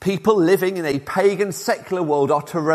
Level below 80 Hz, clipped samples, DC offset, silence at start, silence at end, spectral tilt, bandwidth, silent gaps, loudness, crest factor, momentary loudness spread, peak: -58 dBFS; under 0.1%; under 0.1%; 0 s; 0 s; -5.5 dB/octave; 15.5 kHz; none; -19 LUFS; 16 dB; 6 LU; -2 dBFS